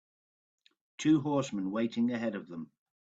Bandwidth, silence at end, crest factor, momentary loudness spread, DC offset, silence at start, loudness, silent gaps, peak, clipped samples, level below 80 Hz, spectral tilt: 8 kHz; 0.4 s; 16 dB; 17 LU; under 0.1%; 1 s; -32 LUFS; none; -16 dBFS; under 0.1%; -74 dBFS; -6 dB/octave